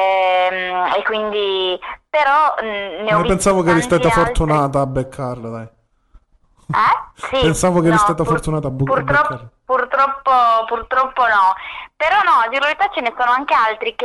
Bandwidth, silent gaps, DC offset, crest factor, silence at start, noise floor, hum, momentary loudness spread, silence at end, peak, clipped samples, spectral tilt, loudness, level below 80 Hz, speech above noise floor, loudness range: 12.5 kHz; none; under 0.1%; 10 dB; 0 s; -55 dBFS; none; 9 LU; 0 s; -6 dBFS; under 0.1%; -5 dB/octave; -16 LUFS; -36 dBFS; 38 dB; 3 LU